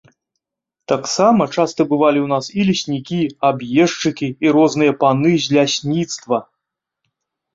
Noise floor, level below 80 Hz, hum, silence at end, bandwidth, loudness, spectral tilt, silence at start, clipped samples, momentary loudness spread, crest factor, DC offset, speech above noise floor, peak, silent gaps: -82 dBFS; -58 dBFS; none; 1.1 s; 7.8 kHz; -16 LUFS; -5 dB/octave; 0.9 s; under 0.1%; 7 LU; 16 dB; under 0.1%; 66 dB; -2 dBFS; none